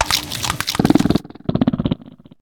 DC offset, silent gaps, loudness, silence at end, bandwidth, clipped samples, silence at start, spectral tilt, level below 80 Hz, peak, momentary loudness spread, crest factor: under 0.1%; none; -19 LUFS; 0.25 s; 19 kHz; under 0.1%; 0 s; -4.5 dB/octave; -38 dBFS; 0 dBFS; 8 LU; 18 dB